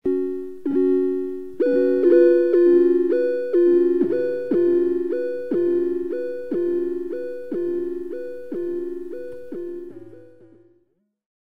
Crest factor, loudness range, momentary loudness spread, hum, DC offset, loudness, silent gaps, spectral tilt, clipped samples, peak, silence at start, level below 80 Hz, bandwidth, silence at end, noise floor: 16 dB; 13 LU; 17 LU; none; 1%; -21 LUFS; none; -8.5 dB/octave; under 0.1%; -6 dBFS; 0 s; -62 dBFS; 4.7 kHz; 0.3 s; -67 dBFS